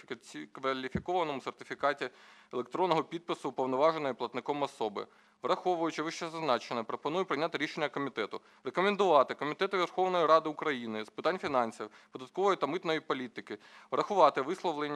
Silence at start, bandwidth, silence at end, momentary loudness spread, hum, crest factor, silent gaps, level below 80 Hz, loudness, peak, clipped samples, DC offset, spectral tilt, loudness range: 0.1 s; 12 kHz; 0 s; 15 LU; none; 24 dB; none; -70 dBFS; -32 LUFS; -10 dBFS; under 0.1%; under 0.1%; -5 dB/octave; 4 LU